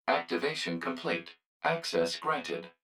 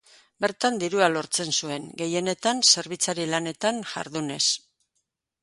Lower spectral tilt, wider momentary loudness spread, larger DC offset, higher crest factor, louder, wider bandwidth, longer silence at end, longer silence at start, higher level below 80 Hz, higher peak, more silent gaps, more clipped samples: first, -4 dB/octave vs -2 dB/octave; second, 5 LU vs 12 LU; neither; about the same, 20 dB vs 22 dB; second, -32 LUFS vs -24 LUFS; first, 15 kHz vs 11.5 kHz; second, 0.15 s vs 0.85 s; second, 0.05 s vs 0.4 s; second, -80 dBFS vs -72 dBFS; second, -12 dBFS vs -4 dBFS; first, 1.46-1.61 s vs none; neither